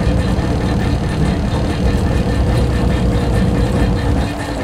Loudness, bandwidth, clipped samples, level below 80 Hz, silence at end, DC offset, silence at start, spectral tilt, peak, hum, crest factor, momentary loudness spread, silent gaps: -16 LUFS; 13 kHz; under 0.1%; -20 dBFS; 0 s; under 0.1%; 0 s; -7 dB/octave; -2 dBFS; none; 12 dB; 2 LU; none